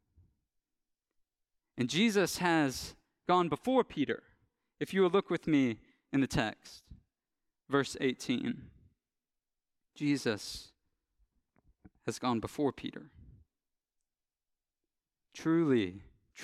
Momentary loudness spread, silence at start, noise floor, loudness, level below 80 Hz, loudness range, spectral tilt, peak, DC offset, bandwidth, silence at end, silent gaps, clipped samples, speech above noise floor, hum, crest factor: 16 LU; 1.75 s; under -90 dBFS; -32 LUFS; -64 dBFS; 8 LU; -5 dB/octave; -14 dBFS; under 0.1%; 15 kHz; 0 s; none; under 0.1%; over 58 dB; none; 20 dB